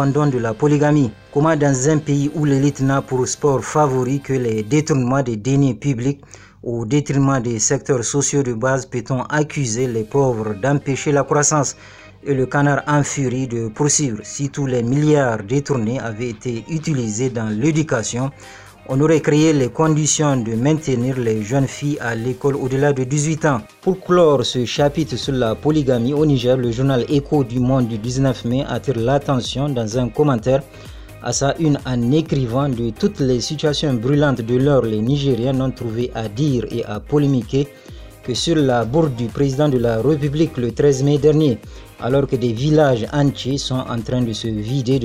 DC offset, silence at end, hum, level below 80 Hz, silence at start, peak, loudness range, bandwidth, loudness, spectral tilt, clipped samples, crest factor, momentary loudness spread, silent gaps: under 0.1%; 0 s; none; -42 dBFS; 0 s; -2 dBFS; 2 LU; 12.5 kHz; -18 LUFS; -5.5 dB/octave; under 0.1%; 16 dB; 8 LU; none